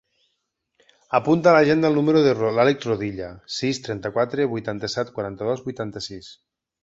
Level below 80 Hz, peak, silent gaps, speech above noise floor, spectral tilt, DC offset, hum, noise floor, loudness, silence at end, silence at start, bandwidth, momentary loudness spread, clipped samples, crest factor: -56 dBFS; -2 dBFS; none; 54 dB; -6 dB/octave; under 0.1%; none; -76 dBFS; -21 LUFS; 0.5 s; 1.1 s; 8 kHz; 14 LU; under 0.1%; 20 dB